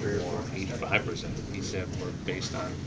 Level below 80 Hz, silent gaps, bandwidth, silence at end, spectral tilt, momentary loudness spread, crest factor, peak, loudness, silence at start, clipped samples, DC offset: -46 dBFS; none; 8 kHz; 0 s; -5 dB/octave; 7 LU; 22 dB; -10 dBFS; -32 LUFS; 0 s; under 0.1%; under 0.1%